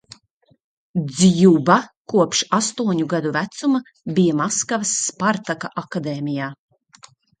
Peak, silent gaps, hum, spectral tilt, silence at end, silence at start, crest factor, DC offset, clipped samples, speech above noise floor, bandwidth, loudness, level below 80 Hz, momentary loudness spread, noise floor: 0 dBFS; 1.97-2.05 s; none; -4.5 dB/octave; 0.85 s; 0.95 s; 20 dB; under 0.1%; under 0.1%; 41 dB; 9.4 kHz; -19 LUFS; -60 dBFS; 12 LU; -60 dBFS